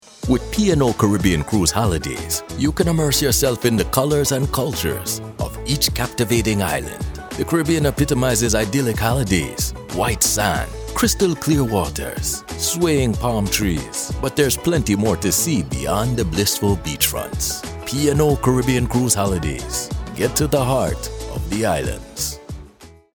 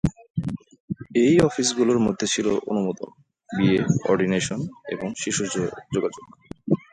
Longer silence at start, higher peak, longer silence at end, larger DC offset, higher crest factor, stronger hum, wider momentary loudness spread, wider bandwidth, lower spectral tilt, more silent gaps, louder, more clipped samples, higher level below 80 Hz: first, 0.2 s vs 0.05 s; first, 0 dBFS vs -4 dBFS; about the same, 0.25 s vs 0.15 s; neither; about the same, 20 dB vs 18 dB; neither; second, 8 LU vs 16 LU; first, over 20 kHz vs 11 kHz; about the same, -4.5 dB/octave vs -5 dB/octave; second, none vs 0.30-0.34 s, 0.80-0.88 s; first, -19 LUFS vs -23 LUFS; neither; first, -32 dBFS vs -50 dBFS